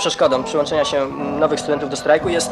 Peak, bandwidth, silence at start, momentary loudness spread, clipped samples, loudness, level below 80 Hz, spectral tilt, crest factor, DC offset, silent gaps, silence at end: -2 dBFS; 13 kHz; 0 s; 5 LU; under 0.1%; -18 LUFS; -48 dBFS; -3.5 dB/octave; 16 dB; under 0.1%; none; 0 s